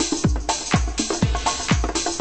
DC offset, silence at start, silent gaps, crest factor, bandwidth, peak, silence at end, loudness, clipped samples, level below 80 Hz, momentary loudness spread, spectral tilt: under 0.1%; 0 s; none; 18 dB; 8.8 kHz; -4 dBFS; 0 s; -22 LUFS; under 0.1%; -28 dBFS; 2 LU; -4 dB/octave